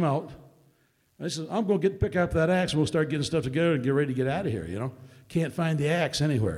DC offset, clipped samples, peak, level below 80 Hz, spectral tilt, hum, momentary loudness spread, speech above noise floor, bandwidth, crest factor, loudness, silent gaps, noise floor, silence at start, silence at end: under 0.1%; under 0.1%; -12 dBFS; -50 dBFS; -6 dB/octave; none; 10 LU; 41 dB; 13.5 kHz; 14 dB; -27 LUFS; none; -67 dBFS; 0 s; 0 s